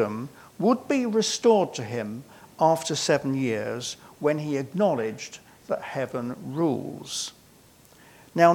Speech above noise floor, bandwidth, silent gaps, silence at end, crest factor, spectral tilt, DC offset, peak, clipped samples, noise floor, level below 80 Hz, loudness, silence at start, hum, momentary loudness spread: 29 dB; 18 kHz; none; 0 s; 22 dB; -4.5 dB/octave; under 0.1%; -4 dBFS; under 0.1%; -55 dBFS; -70 dBFS; -26 LUFS; 0 s; none; 14 LU